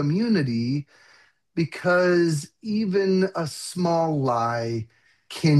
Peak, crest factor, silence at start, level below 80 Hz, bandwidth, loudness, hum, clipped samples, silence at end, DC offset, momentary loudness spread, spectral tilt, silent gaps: -8 dBFS; 16 dB; 0 s; -66 dBFS; 12.5 kHz; -24 LUFS; none; under 0.1%; 0 s; under 0.1%; 10 LU; -6.5 dB/octave; none